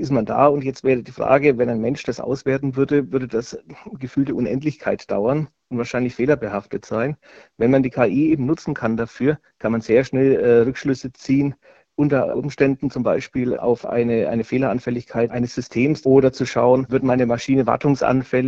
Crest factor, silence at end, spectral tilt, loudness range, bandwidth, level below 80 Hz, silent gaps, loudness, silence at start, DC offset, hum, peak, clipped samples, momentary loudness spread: 18 dB; 0 s; -7.5 dB/octave; 4 LU; 7.6 kHz; -52 dBFS; none; -20 LUFS; 0 s; under 0.1%; none; -2 dBFS; under 0.1%; 9 LU